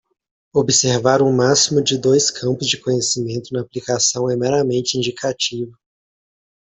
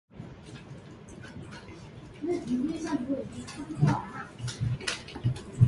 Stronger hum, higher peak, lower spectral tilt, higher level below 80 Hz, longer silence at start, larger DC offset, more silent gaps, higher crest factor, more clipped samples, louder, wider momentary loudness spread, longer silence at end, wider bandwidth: neither; first, -2 dBFS vs -8 dBFS; second, -3.5 dB/octave vs -6.5 dB/octave; about the same, -56 dBFS vs -52 dBFS; first, 0.55 s vs 0.15 s; neither; neither; second, 16 dB vs 24 dB; neither; first, -17 LUFS vs -32 LUFS; second, 9 LU vs 18 LU; first, 1 s vs 0 s; second, 8.4 kHz vs 11.5 kHz